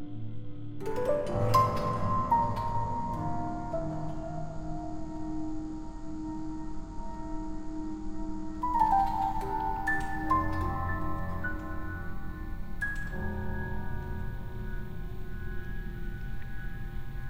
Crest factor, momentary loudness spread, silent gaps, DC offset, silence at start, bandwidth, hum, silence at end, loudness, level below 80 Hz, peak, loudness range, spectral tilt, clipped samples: 20 dB; 14 LU; none; under 0.1%; 0 s; 16 kHz; none; 0 s; -34 LUFS; -40 dBFS; -10 dBFS; 9 LU; -7 dB/octave; under 0.1%